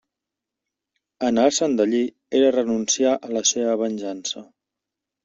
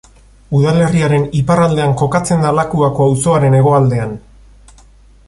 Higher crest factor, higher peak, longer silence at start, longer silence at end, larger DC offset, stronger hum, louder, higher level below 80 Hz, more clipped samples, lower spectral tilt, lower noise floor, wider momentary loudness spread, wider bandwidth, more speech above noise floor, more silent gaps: first, 18 dB vs 12 dB; about the same, -4 dBFS vs -2 dBFS; first, 1.2 s vs 0.5 s; second, 0.8 s vs 1.1 s; neither; neither; second, -21 LUFS vs -13 LUFS; second, -66 dBFS vs -40 dBFS; neither; second, -3 dB/octave vs -7 dB/octave; first, -86 dBFS vs -43 dBFS; first, 10 LU vs 5 LU; second, 8 kHz vs 11.5 kHz; first, 65 dB vs 32 dB; neither